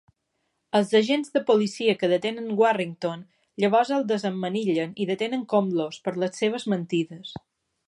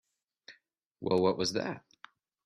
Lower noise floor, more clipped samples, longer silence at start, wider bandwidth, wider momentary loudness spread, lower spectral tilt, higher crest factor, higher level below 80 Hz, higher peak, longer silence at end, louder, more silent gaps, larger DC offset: first, -76 dBFS vs -70 dBFS; neither; first, 0.75 s vs 0.5 s; about the same, 11.5 kHz vs 12.5 kHz; second, 10 LU vs 13 LU; about the same, -5.5 dB/octave vs -5 dB/octave; about the same, 16 dB vs 18 dB; about the same, -72 dBFS vs -68 dBFS; first, -8 dBFS vs -16 dBFS; second, 0.5 s vs 0.65 s; first, -25 LUFS vs -31 LUFS; second, none vs 0.86-0.90 s; neither